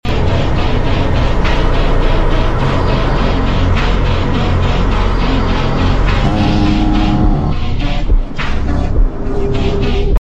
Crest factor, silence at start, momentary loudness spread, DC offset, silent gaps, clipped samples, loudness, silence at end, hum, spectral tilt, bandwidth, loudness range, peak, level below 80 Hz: 10 dB; 0.05 s; 5 LU; under 0.1%; none; under 0.1%; -15 LUFS; 0 s; none; -7 dB/octave; 7.8 kHz; 2 LU; 0 dBFS; -14 dBFS